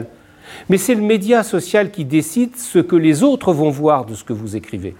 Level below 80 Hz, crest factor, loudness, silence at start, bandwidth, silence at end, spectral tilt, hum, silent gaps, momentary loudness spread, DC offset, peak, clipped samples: -56 dBFS; 14 dB; -16 LUFS; 0 s; 17 kHz; 0.05 s; -5.5 dB/octave; none; none; 13 LU; under 0.1%; -2 dBFS; under 0.1%